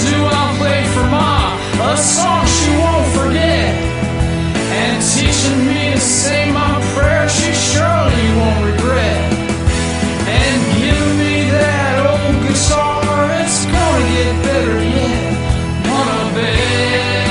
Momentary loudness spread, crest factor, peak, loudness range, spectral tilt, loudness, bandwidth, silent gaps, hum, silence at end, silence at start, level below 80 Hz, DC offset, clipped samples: 4 LU; 14 dB; 0 dBFS; 2 LU; -4.5 dB/octave; -14 LUFS; 11 kHz; none; none; 0 s; 0 s; -26 dBFS; 0.1%; under 0.1%